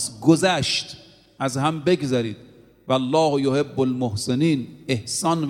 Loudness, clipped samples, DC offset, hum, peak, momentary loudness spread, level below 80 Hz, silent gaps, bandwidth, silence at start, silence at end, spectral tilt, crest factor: -22 LUFS; under 0.1%; under 0.1%; none; -2 dBFS; 11 LU; -58 dBFS; none; 16 kHz; 0 s; 0 s; -5 dB/octave; 20 dB